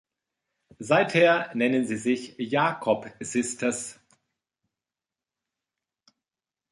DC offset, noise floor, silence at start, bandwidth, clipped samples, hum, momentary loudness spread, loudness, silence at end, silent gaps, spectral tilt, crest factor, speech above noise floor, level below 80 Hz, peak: under 0.1%; under -90 dBFS; 0.8 s; 11.5 kHz; under 0.1%; none; 10 LU; -25 LUFS; 2.8 s; none; -4.5 dB/octave; 22 dB; over 65 dB; -72 dBFS; -6 dBFS